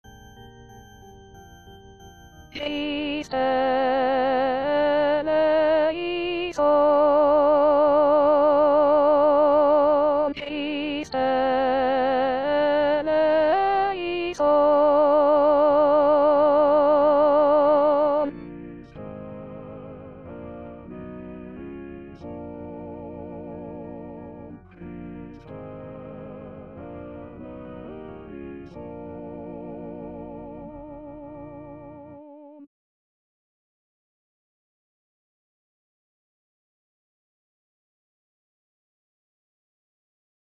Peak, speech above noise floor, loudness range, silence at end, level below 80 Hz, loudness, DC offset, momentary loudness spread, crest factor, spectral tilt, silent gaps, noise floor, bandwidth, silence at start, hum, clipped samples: -10 dBFS; 22 dB; 21 LU; 7.8 s; -54 dBFS; -20 LUFS; under 0.1%; 22 LU; 14 dB; -6.5 dB/octave; none; -47 dBFS; 6.8 kHz; 0.35 s; none; under 0.1%